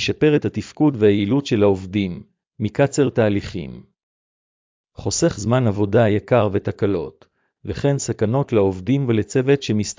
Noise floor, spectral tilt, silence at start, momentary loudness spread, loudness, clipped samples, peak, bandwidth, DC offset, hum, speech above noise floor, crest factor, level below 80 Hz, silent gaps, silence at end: under -90 dBFS; -6 dB/octave; 0 s; 11 LU; -19 LUFS; under 0.1%; -4 dBFS; 7.6 kHz; under 0.1%; none; over 71 dB; 16 dB; -44 dBFS; 4.03-4.84 s; 0.05 s